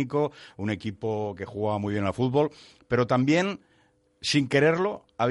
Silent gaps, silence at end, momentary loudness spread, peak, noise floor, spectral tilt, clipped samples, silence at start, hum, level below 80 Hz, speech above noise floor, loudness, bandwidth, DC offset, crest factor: none; 0 s; 10 LU; -10 dBFS; -65 dBFS; -6 dB/octave; under 0.1%; 0 s; none; -60 dBFS; 39 dB; -26 LUFS; 11.5 kHz; under 0.1%; 18 dB